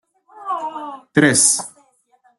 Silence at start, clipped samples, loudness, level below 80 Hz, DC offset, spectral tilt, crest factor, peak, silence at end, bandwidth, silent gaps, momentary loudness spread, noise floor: 0.35 s; under 0.1%; -16 LUFS; -62 dBFS; under 0.1%; -2.5 dB/octave; 20 dB; -2 dBFS; 0.7 s; 12.5 kHz; none; 21 LU; -58 dBFS